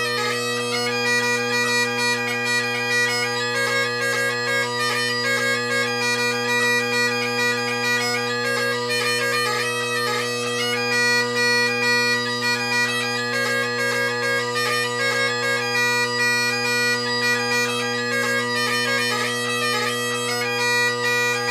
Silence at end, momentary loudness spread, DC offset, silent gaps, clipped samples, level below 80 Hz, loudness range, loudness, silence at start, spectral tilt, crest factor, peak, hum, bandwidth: 0 s; 4 LU; under 0.1%; none; under 0.1%; -72 dBFS; 1 LU; -20 LUFS; 0 s; -2 dB/octave; 14 dB; -8 dBFS; none; 16 kHz